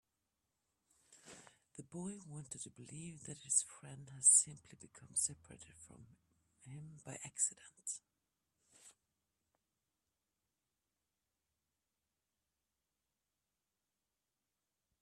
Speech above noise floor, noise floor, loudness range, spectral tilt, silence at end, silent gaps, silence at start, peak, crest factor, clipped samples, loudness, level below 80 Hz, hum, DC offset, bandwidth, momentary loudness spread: over 49 dB; under -90 dBFS; 17 LU; -2 dB/octave; 6.1 s; none; 1.1 s; -16 dBFS; 28 dB; under 0.1%; -35 LUFS; -82 dBFS; none; under 0.1%; 14 kHz; 27 LU